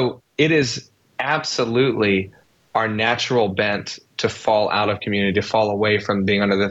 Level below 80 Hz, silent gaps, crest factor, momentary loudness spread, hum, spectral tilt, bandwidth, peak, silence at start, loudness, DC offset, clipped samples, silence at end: -56 dBFS; none; 14 dB; 8 LU; none; -5 dB/octave; 8.2 kHz; -6 dBFS; 0 s; -20 LUFS; under 0.1%; under 0.1%; 0 s